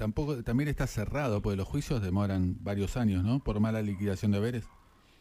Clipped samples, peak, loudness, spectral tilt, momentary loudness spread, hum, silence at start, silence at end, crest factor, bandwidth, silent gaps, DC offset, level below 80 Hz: under 0.1%; -18 dBFS; -31 LUFS; -7.5 dB/octave; 4 LU; none; 0 s; 0.5 s; 12 dB; 15.5 kHz; none; under 0.1%; -44 dBFS